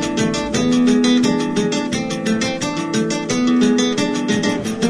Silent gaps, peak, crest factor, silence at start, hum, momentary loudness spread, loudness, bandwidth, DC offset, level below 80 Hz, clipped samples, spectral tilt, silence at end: none; -4 dBFS; 12 dB; 0 s; none; 6 LU; -17 LUFS; 11 kHz; under 0.1%; -46 dBFS; under 0.1%; -4.5 dB/octave; 0 s